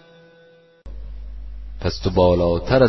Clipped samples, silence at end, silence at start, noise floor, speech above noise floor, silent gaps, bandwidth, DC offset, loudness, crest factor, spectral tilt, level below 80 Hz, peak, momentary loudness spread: under 0.1%; 0 s; 0 s; -51 dBFS; 35 dB; none; 6.2 kHz; under 0.1%; -19 LUFS; 20 dB; -7.5 dB/octave; -34 dBFS; -2 dBFS; 22 LU